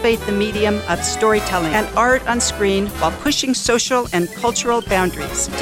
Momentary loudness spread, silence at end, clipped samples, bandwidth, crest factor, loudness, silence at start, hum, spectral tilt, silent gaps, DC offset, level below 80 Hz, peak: 4 LU; 0 s; under 0.1%; 16.5 kHz; 16 dB; -18 LUFS; 0 s; none; -3 dB/octave; none; under 0.1%; -36 dBFS; -2 dBFS